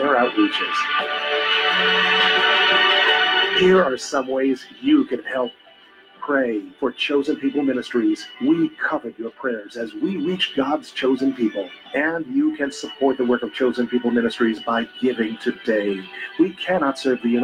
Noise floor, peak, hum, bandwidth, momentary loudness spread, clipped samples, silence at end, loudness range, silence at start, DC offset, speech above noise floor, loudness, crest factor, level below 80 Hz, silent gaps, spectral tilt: -49 dBFS; -4 dBFS; none; 11 kHz; 11 LU; under 0.1%; 0 s; 7 LU; 0 s; under 0.1%; 28 dB; -20 LUFS; 16 dB; -60 dBFS; none; -4 dB/octave